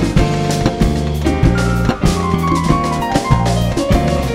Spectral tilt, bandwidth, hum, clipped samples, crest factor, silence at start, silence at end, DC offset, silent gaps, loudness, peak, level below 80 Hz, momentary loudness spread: -6 dB/octave; 16 kHz; none; under 0.1%; 14 dB; 0 s; 0 s; under 0.1%; none; -15 LUFS; 0 dBFS; -22 dBFS; 2 LU